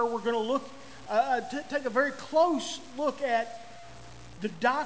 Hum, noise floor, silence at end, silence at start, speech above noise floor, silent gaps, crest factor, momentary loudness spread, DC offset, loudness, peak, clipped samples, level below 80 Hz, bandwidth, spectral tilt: none; -48 dBFS; 0 s; 0 s; 19 dB; none; 18 dB; 21 LU; 0.4%; -29 LUFS; -12 dBFS; under 0.1%; -64 dBFS; 8 kHz; -4 dB/octave